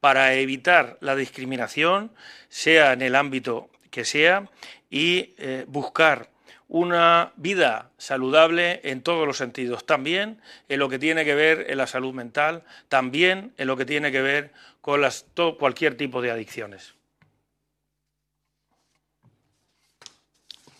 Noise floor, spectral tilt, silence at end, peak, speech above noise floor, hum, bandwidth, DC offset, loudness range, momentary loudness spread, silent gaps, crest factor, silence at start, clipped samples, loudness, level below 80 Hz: -79 dBFS; -3.5 dB/octave; 3.95 s; 0 dBFS; 57 dB; none; 14 kHz; under 0.1%; 6 LU; 13 LU; none; 22 dB; 0.05 s; under 0.1%; -22 LUFS; -74 dBFS